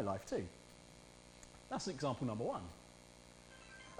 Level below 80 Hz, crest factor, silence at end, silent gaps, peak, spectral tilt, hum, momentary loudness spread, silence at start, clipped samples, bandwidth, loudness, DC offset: -68 dBFS; 18 dB; 0 s; none; -26 dBFS; -5.5 dB/octave; 60 Hz at -60 dBFS; 19 LU; 0 s; under 0.1%; 15.5 kHz; -43 LUFS; under 0.1%